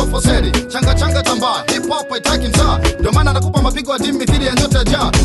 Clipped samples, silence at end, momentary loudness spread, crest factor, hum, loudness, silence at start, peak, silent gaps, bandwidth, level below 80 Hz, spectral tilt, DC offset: under 0.1%; 0 s; 4 LU; 12 dB; none; -15 LUFS; 0 s; -2 dBFS; none; 12.5 kHz; -20 dBFS; -4.5 dB/octave; under 0.1%